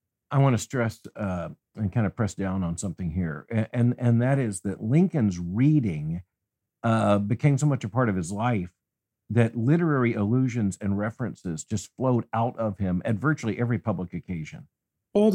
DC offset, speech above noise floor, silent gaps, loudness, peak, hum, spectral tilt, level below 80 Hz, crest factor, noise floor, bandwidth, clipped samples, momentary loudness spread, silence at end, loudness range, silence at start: under 0.1%; 60 dB; none; -26 LUFS; -8 dBFS; none; -7.5 dB/octave; -60 dBFS; 18 dB; -85 dBFS; 11 kHz; under 0.1%; 10 LU; 0 s; 3 LU; 0.3 s